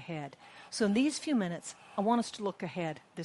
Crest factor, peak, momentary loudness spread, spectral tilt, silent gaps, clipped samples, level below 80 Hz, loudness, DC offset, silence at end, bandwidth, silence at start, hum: 16 dB; -16 dBFS; 13 LU; -5 dB/octave; none; under 0.1%; -74 dBFS; -33 LUFS; under 0.1%; 0 s; 11.5 kHz; 0 s; none